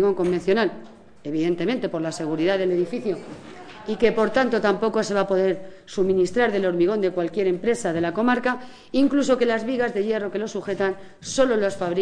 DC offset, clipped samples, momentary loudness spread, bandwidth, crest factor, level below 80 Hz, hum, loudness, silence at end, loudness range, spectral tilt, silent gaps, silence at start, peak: under 0.1%; under 0.1%; 10 LU; 10 kHz; 16 dB; -54 dBFS; none; -23 LUFS; 0 s; 3 LU; -5.5 dB/octave; none; 0 s; -6 dBFS